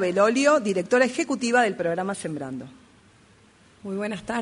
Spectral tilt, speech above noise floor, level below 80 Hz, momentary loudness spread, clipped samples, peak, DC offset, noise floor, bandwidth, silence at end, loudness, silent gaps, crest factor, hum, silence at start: -4.5 dB/octave; 32 dB; -64 dBFS; 14 LU; under 0.1%; -6 dBFS; under 0.1%; -56 dBFS; 11 kHz; 0 s; -23 LUFS; none; 18 dB; none; 0 s